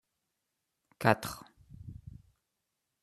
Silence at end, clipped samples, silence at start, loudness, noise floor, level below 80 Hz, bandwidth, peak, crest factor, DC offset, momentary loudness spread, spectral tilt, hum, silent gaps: 0.9 s; under 0.1%; 1 s; -31 LUFS; -85 dBFS; -62 dBFS; 14 kHz; -6 dBFS; 32 dB; under 0.1%; 23 LU; -5.5 dB/octave; none; none